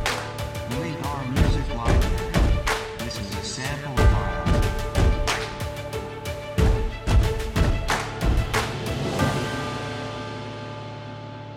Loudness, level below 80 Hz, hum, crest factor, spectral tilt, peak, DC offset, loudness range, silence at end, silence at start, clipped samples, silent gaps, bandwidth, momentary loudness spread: -25 LUFS; -28 dBFS; none; 18 dB; -5.5 dB/octave; -6 dBFS; under 0.1%; 2 LU; 0 s; 0 s; under 0.1%; none; 16.5 kHz; 10 LU